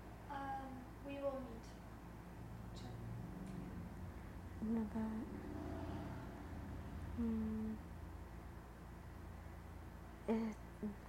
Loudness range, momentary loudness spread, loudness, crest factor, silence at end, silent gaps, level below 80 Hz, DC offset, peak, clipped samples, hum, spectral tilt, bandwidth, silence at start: 4 LU; 13 LU; -48 LUFS; 18 dB; 0 s; none; -56 dBFS; under 0.1%; -28 dBFS; under 0.1%; none; -7.5 dB/octave; 16 kHz; 0 s